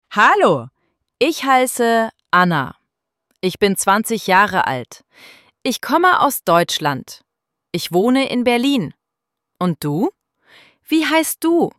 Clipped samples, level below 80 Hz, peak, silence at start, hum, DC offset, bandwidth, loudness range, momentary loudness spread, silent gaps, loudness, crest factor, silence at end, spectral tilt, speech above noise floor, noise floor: under 0.1%; -60 dBFS; -2 dBFS; 0.1 s; none; under 0.1%; 16.5 kHz; 3 LU; 11 LU; none; -17 LUFS; 16 dB; 0.1 s; -4 dB/octave; 65 dB; -81 dBFS